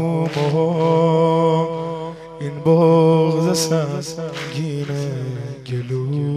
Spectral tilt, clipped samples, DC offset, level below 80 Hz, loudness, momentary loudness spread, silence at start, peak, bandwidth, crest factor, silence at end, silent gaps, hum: -6.5 dB/octave; under 0.1%; under 0.1%; -56 dBFS; -18 LUFS; 14 LU; 0 s; -4 dBFS; 14 kHz; 14 dB; 0 s; none; none